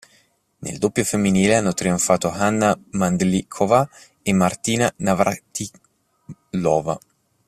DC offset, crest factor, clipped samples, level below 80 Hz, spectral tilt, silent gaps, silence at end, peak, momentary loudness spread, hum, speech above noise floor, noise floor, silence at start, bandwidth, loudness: under 0.1%; 20 dB; under 0.1%; -52 dBFS; -5 dB/octave; none; 0.5 s; -2 dBFS; 12 LU; none; 40 dB; -60 dBFS; 0.6 s; 14.5 kHz; -20 LUFS